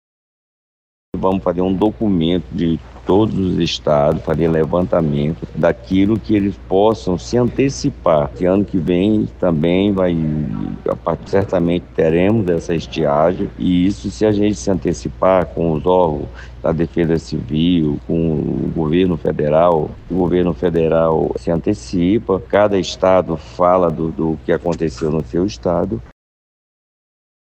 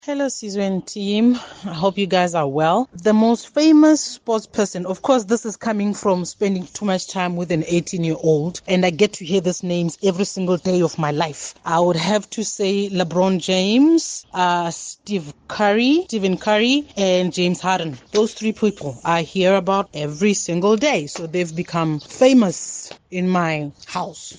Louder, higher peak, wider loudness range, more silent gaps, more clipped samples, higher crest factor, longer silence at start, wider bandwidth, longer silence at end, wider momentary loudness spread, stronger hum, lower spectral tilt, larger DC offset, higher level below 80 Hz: about the same, -17 LUFS vs -19 LUFS; about the same, -2 dBFS vs -2 dBFS; about the same, 2 LU vs 3 LU; neither; neither; about the same, 14 dB vs 18 dB; first, 1.15 s vs 0.05 s; second, 8.6 kHz vs 10 kHz; first, 1.3 s vs 0 s; second, 6 LU vs 9 LU; neither; first, -7 dB/octave vs -5 dB/octave; neither; first, -36 dBFS vs -58 dBFS